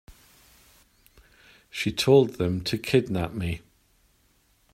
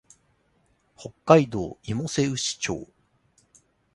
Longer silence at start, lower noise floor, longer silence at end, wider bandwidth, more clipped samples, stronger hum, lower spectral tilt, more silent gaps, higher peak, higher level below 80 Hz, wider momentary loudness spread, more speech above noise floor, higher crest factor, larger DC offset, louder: first, 1.75 s vs 1 s; about the same, -65 dBFS vs -67 dBFS; about the same, 1.15 s vs 1.1 s; first, 16 kHz vs 11.5 kHz; neither; neither; about the same, -6 dB/octave vs -5 dB/octave; neither; second, -6 dBFS vs -2 dBFS; about the same, -54 dBFS vs -56 dBFS; second, 13 LU vs 18 LU; about the same, 41 dB vs 43 dB; about the same, 22 dB vs 24 dB; neither; about the same, -24 LUFS vs -24 LUFS